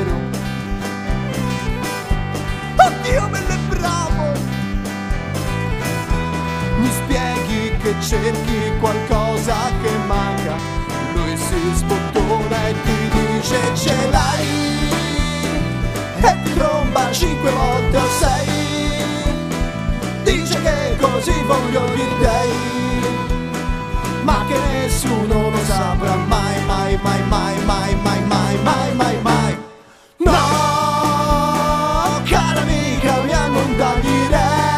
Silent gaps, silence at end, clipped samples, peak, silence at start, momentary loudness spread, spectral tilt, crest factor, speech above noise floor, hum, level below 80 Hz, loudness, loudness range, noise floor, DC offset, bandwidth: none; 0 s; under 0.1%; 0 dBFS; 0 s; 7 LU; -5 dB/octave; 18 dB; 28 dB; none; -26 dBFS; -18 LUFS; 3 LU; -44 dBFS; under 0.1%; 15.5 kHz